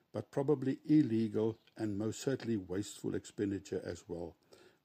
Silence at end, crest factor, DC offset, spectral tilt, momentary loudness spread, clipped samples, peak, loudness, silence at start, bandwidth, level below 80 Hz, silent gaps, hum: 0.5 s; 18 dB; under 0.1%; -7 dB/octave; 13 LU; under 0.1%; -20 dBFS; -36 LUFS; 0.15 s; 15 kHz; -72 dBFS; none; none